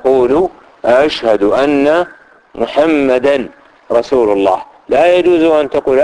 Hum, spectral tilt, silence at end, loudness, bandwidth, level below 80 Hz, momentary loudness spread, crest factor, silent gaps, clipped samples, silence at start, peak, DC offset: none; -5.5 dB/octave; 0 s; -12 LUFS; 10.5 kHz; -44 dBFS; 9 LU; 12 dB; none; under 0.1%; 0.05 s; 0 dBFS; under 0.1%